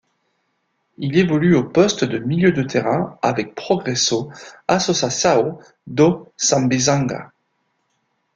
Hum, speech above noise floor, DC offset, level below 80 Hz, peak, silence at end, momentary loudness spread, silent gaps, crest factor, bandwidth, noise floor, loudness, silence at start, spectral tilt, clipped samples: none; 51 dB; under 0.1%; -54 dBFS; -2 dBFS; 1.1 s; 9 LU; none; 18 dB; 9.4 kHz; -69 dBFS; -18 LUFS; 1 s; -4.5 dB/octave; under 0.1%